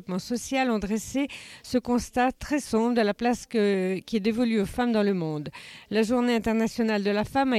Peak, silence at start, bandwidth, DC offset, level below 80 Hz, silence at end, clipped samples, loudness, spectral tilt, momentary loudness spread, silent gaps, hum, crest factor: -12 dBFS; 0.1 s; 14 kHz; under 0.1%; -50 dBFS; 0 s; under 0.1%; -26 LUFS; -5.5 dB/octave; 6 LU; none; none; 14 dB